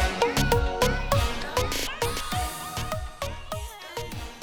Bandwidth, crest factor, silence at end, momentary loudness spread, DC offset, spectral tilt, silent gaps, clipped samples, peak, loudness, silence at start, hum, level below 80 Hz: over 20 kHz; 20 dB; 0 s; 12 LU; under 0.1%; -4 dB/octave; none; under 0.1%; -8 dBFS; -28 LUFS; 0 s; none; -34 dBFS